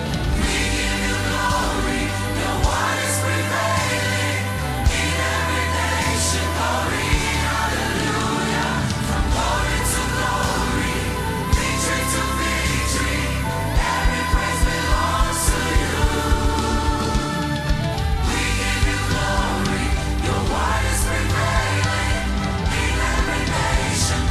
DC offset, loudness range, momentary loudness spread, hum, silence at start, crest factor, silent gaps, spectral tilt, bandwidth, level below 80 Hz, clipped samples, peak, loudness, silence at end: under 0.1%; 1 LU; 3 LU; none; 0 s; 16 dB; none; -4 dB/octave; 15 kHz; -26 dBFS; under 0.1%; -4 dBFS; -21 LUFS; 0 s